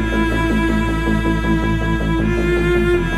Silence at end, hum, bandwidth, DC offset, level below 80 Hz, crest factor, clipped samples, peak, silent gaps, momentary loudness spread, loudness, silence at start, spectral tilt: 0 s; none; 13 kHz; under 0.1%; -22 dBFS; 12 dB; under 0.1%; -4 dBFS; none; 2 LU; -17 LUFS; 0 s; -7 dB/octave